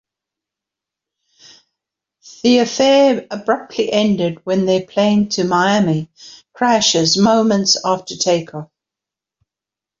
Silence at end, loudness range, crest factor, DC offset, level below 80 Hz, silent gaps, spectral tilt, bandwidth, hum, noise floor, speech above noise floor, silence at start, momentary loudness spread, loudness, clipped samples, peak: 1.35 s; 3 LU; 16 dB; under 0.1%; -58 dBFS; none; -4 dB/octave; 7.6 kHz; none; -87 dBFS; 72 dB; 2.25 s; 7 LU; -15 LUFS; under 0.1%; -2 dBFS